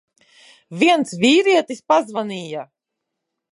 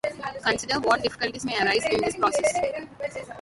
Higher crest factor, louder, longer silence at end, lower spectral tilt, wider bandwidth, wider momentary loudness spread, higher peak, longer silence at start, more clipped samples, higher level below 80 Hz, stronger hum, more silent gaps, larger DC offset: about the same, 18 dB vs 20 dB; first, -17 LUFS vs -25 LUFS; first, 0.85 s vs 0 s; about the same, -4 dB/octave vs -3 dB/octave; about the same, 11.5 kHz vs 11.5 kHz; first, 16 LU vs 11 LU; first, -2 dBFS vs -6 dBFS; first, 0.7 s vs 0.05 s; neither; second, -74 dBFS vs -56 dBFS; neither; neither; neither